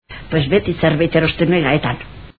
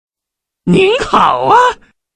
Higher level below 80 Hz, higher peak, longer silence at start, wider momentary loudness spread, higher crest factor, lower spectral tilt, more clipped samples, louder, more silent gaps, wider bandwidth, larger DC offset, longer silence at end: about the same, -38 dBFS vs -42 dBFS; about the same, 0 dBFS vs 0 dBFS; second, 0.1 s vs 0.65 s; second, 7 LU vs 11 LU; about the same, 16 dB vs 12 dB; first, -10 dB/octave vs -5.5 dB/octave; neither; second, -16 LUFS vs -10 LUFS; neither; second, 4.8 kHz vs 10 kHz; first, 0.7% vs under 0.1%; second, 0.1 s vs 0.4 s